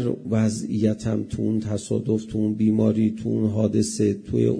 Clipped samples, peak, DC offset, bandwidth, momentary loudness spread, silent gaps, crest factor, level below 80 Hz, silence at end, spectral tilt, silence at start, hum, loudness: under 0.1%; -8 dBFS; under 0.1%; 10.5 kHz; 6 LU; none; 16 dB; -50 dBFS; 0 s; -7 dB/octave; 0 s; none; -23 LUFS